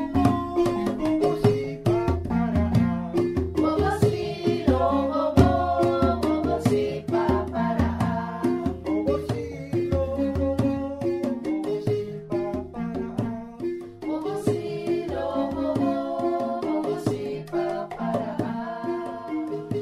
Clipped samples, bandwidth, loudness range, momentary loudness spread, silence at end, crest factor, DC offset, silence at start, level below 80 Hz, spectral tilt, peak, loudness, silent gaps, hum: under 0.1%; 14.5 kHz; 6 LU; 8 LU; 0 s; 22 dB; under 0.1%; 0 s; -40 dBFS; -8 dB/octave; -4 dBFS; -25 LUFS; none; none